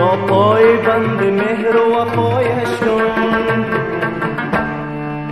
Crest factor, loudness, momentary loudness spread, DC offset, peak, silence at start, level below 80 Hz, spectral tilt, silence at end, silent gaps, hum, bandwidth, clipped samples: 14 dB; -15 LUFS; 8 LU; under 0.1%; 0 dBFS; 0 s; -46 dBFS; -7 dB/octave; 0 s; none; none; 12.5 kHz; under 0.1%